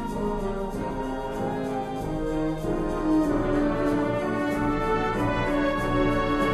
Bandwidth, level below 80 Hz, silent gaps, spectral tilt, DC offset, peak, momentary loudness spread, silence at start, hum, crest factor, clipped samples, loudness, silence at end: 13 kHz; -36 dBFS; none; -7 dB/octave; under 0.1%; -12 dBFS; 7 LU; 0 s; none; 14 dB; under 0.1%; -26 LUFS; 0 s